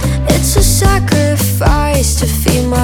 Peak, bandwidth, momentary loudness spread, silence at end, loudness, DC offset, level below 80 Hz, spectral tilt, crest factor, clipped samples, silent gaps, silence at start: 0 dBFS; 18.5 kHz; 3 LU; 0 s; -12 LUFS; under 0.1%; -16 dBFS; -4.5 dB/octave; 10 dB; under 0.1%; none; 0 s